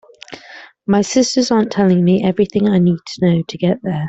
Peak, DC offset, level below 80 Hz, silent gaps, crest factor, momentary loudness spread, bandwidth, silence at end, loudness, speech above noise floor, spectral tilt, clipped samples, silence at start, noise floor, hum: -2 dBFS; under 0.1%; -52 dBFS; none; 12 dB; 18 LU; 8 kHz; 0 s; -15 LUFS; 25 dB; -6 dB/octave; under 0.1%; 0.3 s; -39 dBFS; none